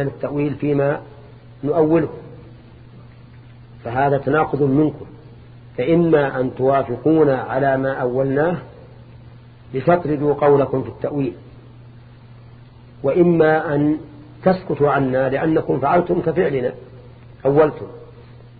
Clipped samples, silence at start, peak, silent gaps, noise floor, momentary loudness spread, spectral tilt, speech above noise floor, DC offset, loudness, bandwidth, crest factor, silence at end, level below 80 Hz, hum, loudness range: under 0.1%; 0 s; -2 dBFS; none; -42 dBFS; 13 LU; -12 dB/octave; 25 dB; under 0.1%; -18 LUFS; 4.8 kHz; 18 dB; 0.1 s; -48 dBFS; none; 4 LU